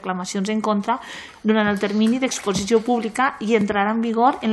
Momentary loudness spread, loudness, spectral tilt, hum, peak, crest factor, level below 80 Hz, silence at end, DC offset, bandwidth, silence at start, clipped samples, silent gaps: 6 LU; -21 LUFS; -5 dB/octave; none; -4 dBFS; 16 dB; -54 dBFS; 0 s; under 0.1%; 12.5 kHz; 0.05 s; under 0.1%; none